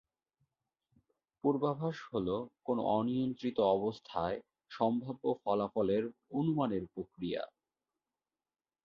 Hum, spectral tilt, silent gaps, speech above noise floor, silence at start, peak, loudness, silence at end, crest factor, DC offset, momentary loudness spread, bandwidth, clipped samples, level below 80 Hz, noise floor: none; -6.5 dB/octave; none; over 56 dB; 1.45 s; -16 dBFS; -35 LUFS; 1.35 s; 18 dB; under 0.1%; 7 LU; 7 kHz; under 0.1%; -68 dBFS; under -90 dBFS